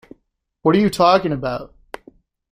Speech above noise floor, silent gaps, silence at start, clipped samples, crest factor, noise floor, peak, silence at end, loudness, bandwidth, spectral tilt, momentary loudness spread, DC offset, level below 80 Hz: 52 dB; none; 0.65 s; under 0.1%; 18 dB; -68 dBFS; -2 dBFS; 0.85 s; -17 LUFS; 15 kHz; -6.5 dB/octave; 24 LU; under 0.1%; -48 dBFS